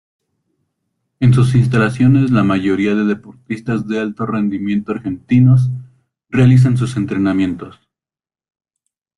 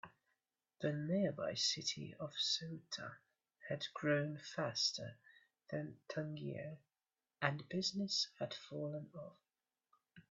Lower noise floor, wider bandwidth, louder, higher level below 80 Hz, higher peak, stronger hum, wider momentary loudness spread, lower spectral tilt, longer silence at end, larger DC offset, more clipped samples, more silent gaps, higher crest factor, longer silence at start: about the same, under -90 dBFS vs under -90 dBFS; first, 11 kHz vs 8.2 kHz; first, -15 LUFS vs -41 LUFS; first, -46 dBFS vs -82 dBFS; first, -2 dBFS vs -18 dBFS; neither; second, 12 LU vs 15 LU; first, -8.5 dB/octave vs -4 dB/octave; first, 1.45 s vs 0.1 s; neither; neither; neither; second, 14 dB vs 26 dB; first, 1.2 s vs 0.05 s